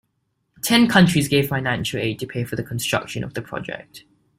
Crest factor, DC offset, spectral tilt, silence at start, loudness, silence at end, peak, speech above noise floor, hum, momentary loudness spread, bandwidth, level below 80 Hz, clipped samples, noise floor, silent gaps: 22 dB; under 0.1%; -5 dB/octave; 0.65 s; -20 LUFS; 0.4 s; 0 dBFS; 51 dB; none; 15 LU; 16 kHz; -52 dBFS; under 0.1%; -72 dBFS; none